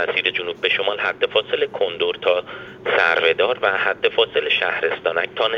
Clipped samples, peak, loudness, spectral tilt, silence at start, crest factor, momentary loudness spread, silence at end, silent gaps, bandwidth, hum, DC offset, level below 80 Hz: under 0.1%; -4 dBFS; -19 LUFS; -4 dB/octave; 0 s; 16 dB; 5 LU; 0 s; none; 6.8 kHz; none; under 0.1%; -62 dBFS